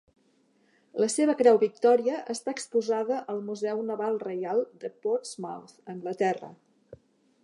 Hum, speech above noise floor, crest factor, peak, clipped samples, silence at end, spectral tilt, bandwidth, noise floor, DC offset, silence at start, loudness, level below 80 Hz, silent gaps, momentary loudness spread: none; 40 dB; 20 dB; -8 dBFS; under 0.1%; 0.5 s; -4.5 dB/octave; 11.5 kHz; -67 dBFS; under 0.1%; 0.95 s; -28 LUFS; -78 dBFS; none; 16 LU